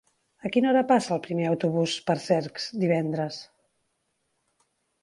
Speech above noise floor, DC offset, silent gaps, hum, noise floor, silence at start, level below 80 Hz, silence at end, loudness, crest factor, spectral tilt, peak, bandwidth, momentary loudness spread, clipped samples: 50 dB; under 0.1%; none; none; -75 dBFS; 0.45 s; -72 dBFS; 1.6 s; -26 LUFS; 20 dB; -6 dB/octave; -8 dBFS; 11.5 kHz; 10 LU; under 0.1%